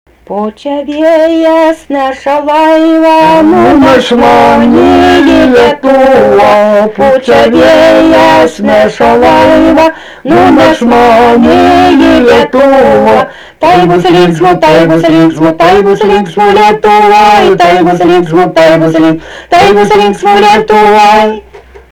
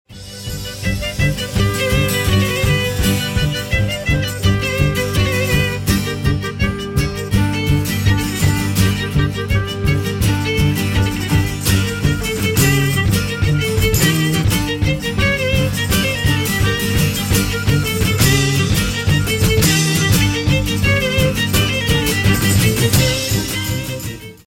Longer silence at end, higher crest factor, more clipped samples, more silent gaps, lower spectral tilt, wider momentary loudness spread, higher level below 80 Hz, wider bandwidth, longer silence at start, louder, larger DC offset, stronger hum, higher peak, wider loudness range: first, 0.35 s vs 0.15 s; second, 4 dB vs 16 dB; first, 3% vs under 0.1%; neither; about the same, -5.5 dB/octave vs -4.5 dB/octave; about the same, 6 LU vs 5 LU; second, -32 dBFS vs -26 dBFS; first, 19 kHz vs 17 kHz; first, 0.3 s vs 0.1 s; first, -4 LUFS vs -16 LUFS; first, 0.4% vs under 0.1%; neither; about the same, 0 dBFS vs 0 dBFS; about the same, 2 LU vs 3 LU